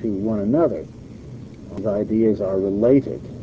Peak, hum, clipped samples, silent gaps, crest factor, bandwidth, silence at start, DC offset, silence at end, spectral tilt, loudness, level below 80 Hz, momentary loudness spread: -4 dBFS; none; under 0.1%; none; 16 dB; 7.6 kHz; 0 s; 0.1%; 0 s; -10 dB/octave; -20 LUFS; -46 dBFS; 21 LU